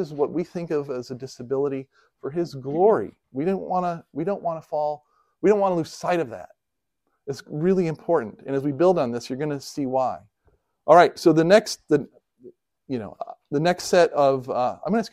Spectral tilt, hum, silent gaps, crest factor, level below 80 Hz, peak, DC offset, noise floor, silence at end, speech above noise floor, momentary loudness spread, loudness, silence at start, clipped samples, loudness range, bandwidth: -6 dB/octave; none; none; 22 dB; -64 dBFS; -2 dBFS; under 0.1%; -83 dBFS; 0.05 s; 61 dB; 16 LU; -23 LUFS; 0 s; under 0.1%; 5 LU; 15 kHz